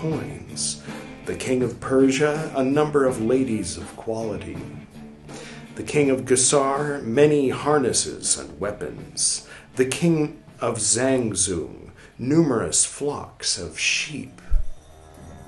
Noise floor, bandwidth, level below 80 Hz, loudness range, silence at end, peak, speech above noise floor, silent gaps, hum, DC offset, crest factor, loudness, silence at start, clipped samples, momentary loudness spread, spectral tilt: -45 dBFS; 12.5 kHz; -38 dBFS; 4 LU; 0 s; -4 dBFS; 22 dB; none; none; under 0.1%; 20 dB; -22 LUFS; 0 s; under 0.1%; 17 LU; -4 dB/octave